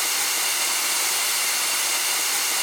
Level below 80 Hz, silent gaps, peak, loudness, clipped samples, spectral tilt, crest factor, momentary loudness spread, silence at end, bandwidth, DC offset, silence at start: -76 dBFS; none; -10 dBFS; -20 LUFS; under 0.1%; 3 dB/octave; 14 dB; 0 LU; 0 s; over 20 kHz; under 0.1%; 0 s